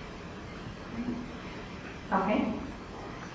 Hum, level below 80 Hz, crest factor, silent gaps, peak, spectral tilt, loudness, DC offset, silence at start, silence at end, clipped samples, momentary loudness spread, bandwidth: none; -50 dBFS; 20 dB; none; -16 dBFS; -6.5 dB/octave; -35 LUFS; under 0.1%; 0 s; 0 s; under 0.1%; 13 LU; 8 kHz